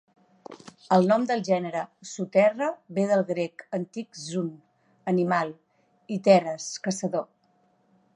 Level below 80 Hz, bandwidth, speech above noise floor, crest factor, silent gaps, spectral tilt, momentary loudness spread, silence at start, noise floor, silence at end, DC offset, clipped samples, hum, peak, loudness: -78 dBFS; 10.5 kHz; 41 dB; 22 dB; none; -5.5 dB/octave; 15 LU; 0.5 s; -66 dBFS; 0.9 s; under 0.1%; under 0.1%; none; -4 dBFS; -26 LUFS